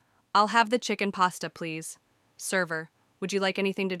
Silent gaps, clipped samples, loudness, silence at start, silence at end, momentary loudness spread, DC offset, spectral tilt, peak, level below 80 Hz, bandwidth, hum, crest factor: none; under 0.1%; -27 LUFS; 0.35 s; 0 s; 14 LU; under 0.1%; -3.5 dB/octave; -8 dBFS; -78 dBFS; 15.5 kHz; none; 20 dB